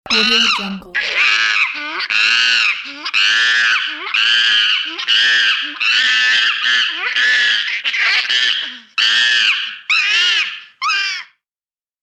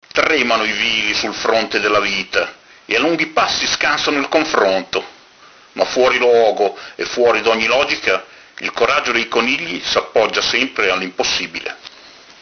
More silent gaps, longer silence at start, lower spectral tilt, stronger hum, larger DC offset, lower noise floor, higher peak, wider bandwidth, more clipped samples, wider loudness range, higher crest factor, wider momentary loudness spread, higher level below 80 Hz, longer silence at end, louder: neither; about the same, 0.05 s vs 0.15 s; second, 0.5 dB/octave vs -2 dB/octave; neither; neither; first, under -90 dBFS vs -45 dBFS; second, -4 dBFS vs 0 dBFS; first, 13 kHz vs 6.6 kHz; neither; about the same, 1 LU vs 1 LU; second, 12 dB vs 18 dB; about the same, 8 LU vs 10 LU; second, -60 dBFS vs -52 dBFS; first, 0.8 s vs 0.35 s; first, -13 LUFS vs -16 LUFS